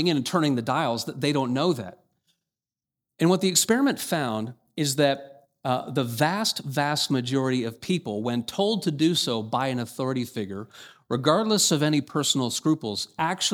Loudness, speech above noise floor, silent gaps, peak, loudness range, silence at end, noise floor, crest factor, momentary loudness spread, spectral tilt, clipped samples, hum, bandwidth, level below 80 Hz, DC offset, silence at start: -25 LUFS; over 65 dB; none; -6 dBFS; 2 LU; 0 s; under -90 dBFS; 20 dB; 10 LU; -4 dB/octave; under 0.1%; none; 20 kHz; -70 dBFS; under 0.1%; 0 s